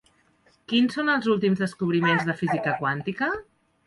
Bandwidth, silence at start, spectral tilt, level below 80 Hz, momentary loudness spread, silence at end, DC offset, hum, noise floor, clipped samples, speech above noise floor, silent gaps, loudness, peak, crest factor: 11.5 kHz; 0.7 s; -6.5 dB/octave; -62 dBFS; 6 LU; 0.45 s; under 0.1%; none; -63 dBFS; under 0.1%; 39 dB; none; -24 LUFS; -10 dBFS; 16 dB